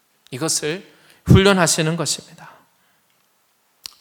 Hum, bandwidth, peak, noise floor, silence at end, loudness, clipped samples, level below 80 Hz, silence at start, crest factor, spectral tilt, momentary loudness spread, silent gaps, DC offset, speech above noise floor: none; 19 kHz; 0 dBFS; -63 dBFS; 1.55 s; -17 LUFS; under 0.1%; -40 dBFS; 0.3 s; 20 dB; -4.5 dB/octave; 22 LU; none; under 0.1%; 46 dB